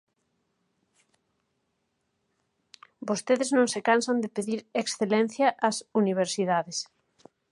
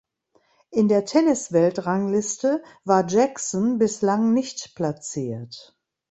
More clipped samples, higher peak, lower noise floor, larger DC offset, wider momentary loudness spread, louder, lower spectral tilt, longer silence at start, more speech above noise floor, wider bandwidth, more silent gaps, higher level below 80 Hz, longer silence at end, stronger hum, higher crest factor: neither; second, -8 dBFS vs -4 dBFS; first, -77 dBFS vs -65 dBFS; neither; about the same, 8 LU vs 10 LU; second, -26 LUFS vs -22 LUFS; second, -4 dB/octave vs -5.5 dB/octave; first, 3 s vs 0.7 s; first, 51 dB vs 43 dB; first, 11.5 kHz vs 8.2 kHz; neither; second, -80 dBFS vs -64 dBFS; first, 0.65 s vs 0.5 s; neither; about the same, 20 dB vs 18 dB